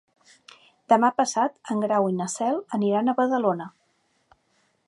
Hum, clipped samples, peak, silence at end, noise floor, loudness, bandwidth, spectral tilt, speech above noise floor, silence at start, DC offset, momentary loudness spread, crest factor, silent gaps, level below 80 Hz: none; under 0.1%; -4 dBFS; 1.2 s; -69 dBFS; -24 LUFS; 11.5 kHz; -5 dB/octave; 45 dB; 0.9 s; under 0.1%; 6 LU; 20 dB; none; -78 dBFS